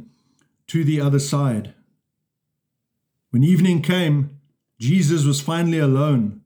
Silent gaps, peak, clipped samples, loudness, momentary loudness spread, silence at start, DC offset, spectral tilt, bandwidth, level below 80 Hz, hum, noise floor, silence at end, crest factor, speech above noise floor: none; -6 dBFS; under 0.1%; -19 LUFS; 8 LU; 0 s; under 0.1%; -6.5 dB/octave; 20 kHz; -70 dBFS; none; -78 dBFS; 0.05 s; 14 dB; 61 dB